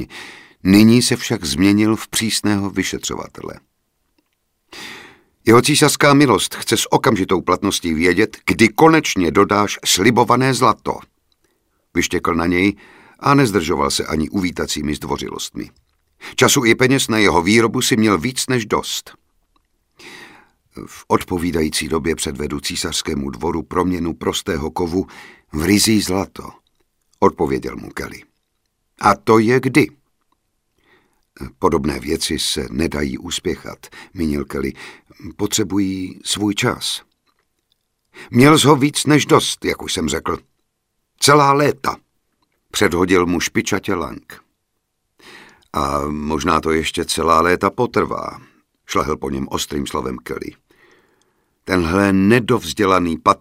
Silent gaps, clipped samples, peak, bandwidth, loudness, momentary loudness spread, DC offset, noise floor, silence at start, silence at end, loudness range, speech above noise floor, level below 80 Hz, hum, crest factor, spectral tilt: none; under 0.1%; 0 dBFS; 16 kHz; -17 LUFS; 17 LU; under 0.1%; -72 dBFS; 0 s; 0.05 s; 8 LU; 55 dB; -42 dBFS; none; 18 dB; -4 dB/octave